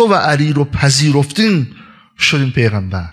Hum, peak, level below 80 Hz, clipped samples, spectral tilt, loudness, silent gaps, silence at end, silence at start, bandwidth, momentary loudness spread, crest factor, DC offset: none; 0 dBFS; -40 dBFS; under 0.1%; -5 dB/octave; -13 LUFS; none; 0 s; 0 s; 13 kHz; 6 LU; 14 dB; under 0.1%